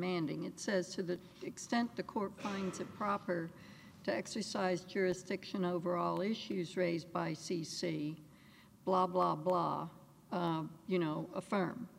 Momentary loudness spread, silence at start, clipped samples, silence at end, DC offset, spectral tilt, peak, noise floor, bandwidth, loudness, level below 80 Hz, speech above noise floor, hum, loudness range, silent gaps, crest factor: 9 LU; 0 s; under 0.1%; 0 s; under 0.1%; -5.5 dB/octave; -20 dBFS; -61 dBFS; 16 kHz; -38 LUFS; -76 dBFS; 24 dB; none; 3 LU; none; 18 dB